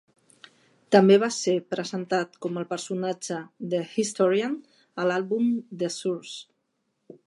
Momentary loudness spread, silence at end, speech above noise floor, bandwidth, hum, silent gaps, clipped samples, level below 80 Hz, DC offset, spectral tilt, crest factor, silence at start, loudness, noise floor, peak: 14 LU; 0.85 s; 51 dB; 11.5 kHz; none; none; under 0.1%; -80 dBFS; under 0.1%; -5 dB/octave; 22 dB; 0.9 s; -26 LUFS; -76 dBFS; -4 dBFS